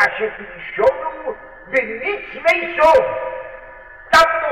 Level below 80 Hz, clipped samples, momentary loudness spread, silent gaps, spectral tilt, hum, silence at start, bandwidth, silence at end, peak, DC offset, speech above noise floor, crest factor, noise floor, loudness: -48 dBFS; under 0.1%; 18 LU; none; -3 dB/octave; none; 0 s; 16 kHz; 0 s; -6 dBFS; 0.2%; 21 dB; 12 dB; -39 dBFS; -17 LUFS